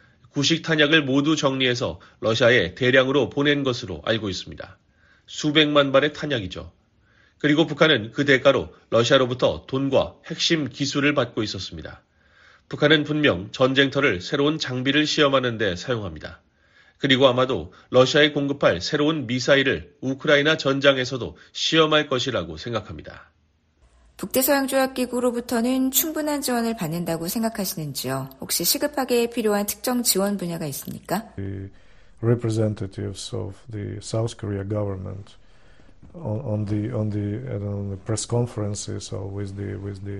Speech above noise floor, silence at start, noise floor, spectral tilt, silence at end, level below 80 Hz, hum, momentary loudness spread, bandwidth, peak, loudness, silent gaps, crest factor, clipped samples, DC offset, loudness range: 41 dB; 0.35 s; -63 dBFS; -4.5 dB/octave; 0 s; -52 dBFS; none; 14 LU; 14 kHz; -2 dBFS; -22 LUFS; none; 20 dB; under 0.1%; under 0.1%; 8 LU